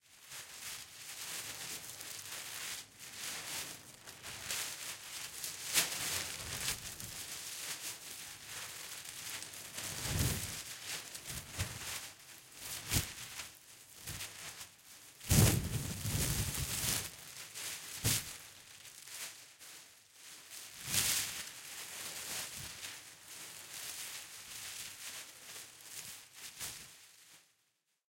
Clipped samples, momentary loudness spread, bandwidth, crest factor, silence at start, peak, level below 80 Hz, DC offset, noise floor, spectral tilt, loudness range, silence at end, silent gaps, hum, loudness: under 0.1%; 16 LU; 17 kHz; 28 dB; 0.05 s; -14 dBFS; -56 dBFS; under 0.1%; -80 dBFS; -2.5 dB/octave; 10 LU; 0.65 s; none; none; -39 LUFS